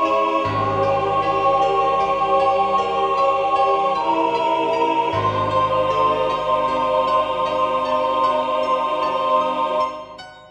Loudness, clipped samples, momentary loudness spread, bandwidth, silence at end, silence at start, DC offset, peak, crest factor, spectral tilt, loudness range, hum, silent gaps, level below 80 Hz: -19 LUFS; under 0.1%; 3 LU; 9.6 kHz; 0.05 s; 0 s; under 0.1%; -6 dBFS; 14 dB; -5.5 dB/octave; 1 LU; none; none; -50 dBFS